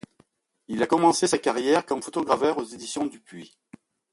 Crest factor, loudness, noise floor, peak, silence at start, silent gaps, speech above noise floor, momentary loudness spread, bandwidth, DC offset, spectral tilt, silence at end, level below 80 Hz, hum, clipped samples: 20 dB; -24 LUFS; -64 dBFS; -6 dBFS; 0.7 s; none; 40 dB; 15 LU; 11.5 kHz; under 0.1%; -4 dB/octave; 0.65 s; -66 dBFS; none; under 0.1%